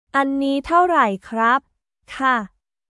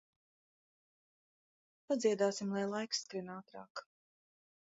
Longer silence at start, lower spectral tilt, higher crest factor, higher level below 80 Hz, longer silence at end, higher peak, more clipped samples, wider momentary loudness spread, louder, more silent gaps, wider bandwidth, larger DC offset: second, 0.15 s vs 1.9 s; about the same, -5 dB/octave vs -4 dB/octave; second, 16 dB vs 22 dB; first, -54 dBFS vs -88 dBFS; second, 0.45 s vs 0.95 s; first, -4 dBFS vs -20 dBFS; neither; second, 7 LU vs 17 LU; first, -19 LUFS vs -36 LUFS; second, none vs 3.70-3.75 s; first, 11.5 kHz vs 7.6 kHz; neither